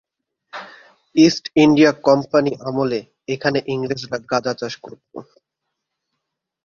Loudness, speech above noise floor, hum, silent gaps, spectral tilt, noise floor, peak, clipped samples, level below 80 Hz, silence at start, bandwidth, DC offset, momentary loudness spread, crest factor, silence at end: -18 LUFS; 62 dB; none; none; -5.5 dB/octave; -79 dBFS; 0 dBFS; under 0.1%; -58 dBFS; 0.55 s; 7.2 kHz; under 0.1%; 22 LU; 20 dB; 1.4 s